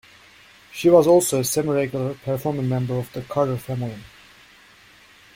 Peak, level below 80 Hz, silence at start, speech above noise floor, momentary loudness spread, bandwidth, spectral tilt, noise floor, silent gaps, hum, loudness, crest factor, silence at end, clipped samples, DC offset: -2 dBFS; -56 dBFS; 0.75 s; 30 dB; 14 LU; 16.5 kHz; -5.5 dB/octave; -51 dBFS; none; none; -21 LUFS; 20 dB; 1.3 s; under 0.1%; under 0.1%